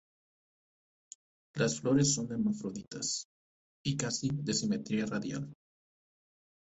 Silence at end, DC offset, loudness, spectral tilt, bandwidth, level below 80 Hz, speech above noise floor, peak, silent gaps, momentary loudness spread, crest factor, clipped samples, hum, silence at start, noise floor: 1.2 s; under 0.1%; -33 LUFS; -4.5 dB/octave; 8.4 kHz; -66 dBFS; over 57 dB; -14 dBFS; 3.25-3.84 s; 13 LU; 20 dB; under 0.1%; none; 1.55 s; under -90 dBFS